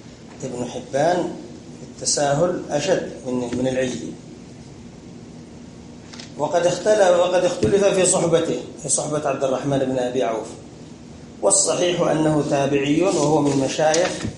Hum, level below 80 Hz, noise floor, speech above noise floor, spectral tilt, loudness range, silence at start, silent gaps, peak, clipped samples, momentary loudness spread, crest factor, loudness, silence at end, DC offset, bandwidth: none; -52 dBFS; -40 dBFS; 20 dB; -4 dB/octave; 8 LU; 0.05 s; none; -4 dBFS; under 0.1%; 24 LU; 18 dB; -20 LUFS; 0 s; under 0.1%; 11.5 kHz